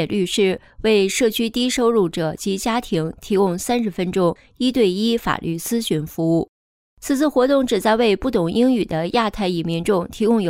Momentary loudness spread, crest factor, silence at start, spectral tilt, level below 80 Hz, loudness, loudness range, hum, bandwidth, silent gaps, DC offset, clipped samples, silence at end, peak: 6 LU; 14 dB; 0 s; -5 dB/octave; -46 dBFS; -20 LUFS; 2 LU; none; 16 kHz; 6.49-6.97 s; under 0.1%; under 0.1%; 0 s; -6 dBFS